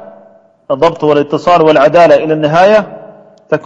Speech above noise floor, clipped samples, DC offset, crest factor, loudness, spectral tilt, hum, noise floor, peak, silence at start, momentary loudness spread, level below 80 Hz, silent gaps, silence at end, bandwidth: 35 dB; 0.4%; under 0.1%; 10 dB; -9 LUFS; -6.5 dB/octave; none; -43 dBFS; 0 dBFS; 0.7 s; 9 LU; -48 dBFS; none; 0.05 s; 8 kHz